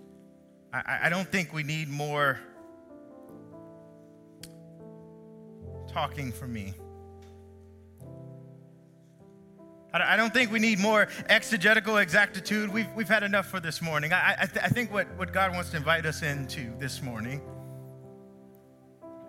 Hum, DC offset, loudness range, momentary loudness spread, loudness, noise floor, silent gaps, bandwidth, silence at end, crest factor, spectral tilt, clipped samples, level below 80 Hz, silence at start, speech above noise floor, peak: none; under 0.1%; 16 LU; 25 LU; -27 LUFS; -56 dBFS; none; 16.5 kHz; 0 s; 24 dB; -4.5 dB/octave; under 0.1%; -64 dBFS; 0.7 s; 28 dB; -6 dBFS